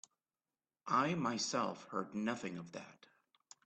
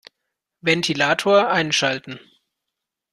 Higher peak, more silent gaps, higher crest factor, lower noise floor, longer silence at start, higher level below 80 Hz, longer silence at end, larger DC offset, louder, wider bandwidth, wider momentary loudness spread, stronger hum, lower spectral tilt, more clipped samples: second, -22 dBFS vs -2 dBFS; neither; about the same, 20 dB vs 20 dB; first, under -90 dBFS vs -83 dBFS; first, 0.85 s vs 0.65 s; second, -82 dBFS vs -64 dBFS; second, 0.75 s vs 0.95 s; neither; second, -38 LUFS vs -19 LUFS; second, 8.8 kHz vs 13 kHz; about the same, 17 LU vs 15 LU; neither; about the same, -4 dB/octave vs -3.5 dB/octave; neither